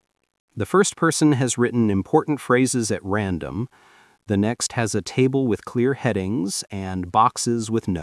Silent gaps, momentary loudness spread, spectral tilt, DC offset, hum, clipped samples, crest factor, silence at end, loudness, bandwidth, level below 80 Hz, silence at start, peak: none; 9 LU; -5 dB/octave; under 0.1%; none; under 0.1%; 18 dB; 0 s; -22 LUFS; 12 kHz; -56 dBFS; 0.55 s; -4 dBFS